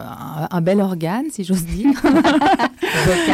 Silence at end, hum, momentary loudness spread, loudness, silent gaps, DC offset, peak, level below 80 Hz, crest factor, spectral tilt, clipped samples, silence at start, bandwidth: 0 s; none; 9 LU; -17 LUFS; none; under 0.1%; -6 dBFS; -38 dBFS; 12 dB; -5.5 dB/octave; under 0.1%; 0 s; 16 kHz